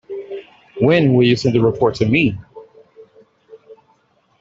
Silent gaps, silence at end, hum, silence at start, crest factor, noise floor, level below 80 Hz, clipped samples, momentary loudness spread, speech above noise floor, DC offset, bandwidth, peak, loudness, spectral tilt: none; 0.65 s; none; 0.1 s; 16 dB; -59 dBFS; -50 dBFS; under 0.1%; 20 LU; 45 dB; under 0.1%; 7.8 kHz; -2 dBFS; -15 LUFS; -7 dB/octave